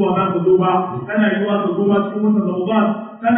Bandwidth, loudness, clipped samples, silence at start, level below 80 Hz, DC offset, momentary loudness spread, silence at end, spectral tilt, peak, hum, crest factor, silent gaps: 3.6 kHz; -17 LUFS; under 0.1%; 0 s; -58 dBFS; under 0.1%; 5 LU; 0 s; -12.5 dB/octave; -4 dBFS; none; 12 dB; none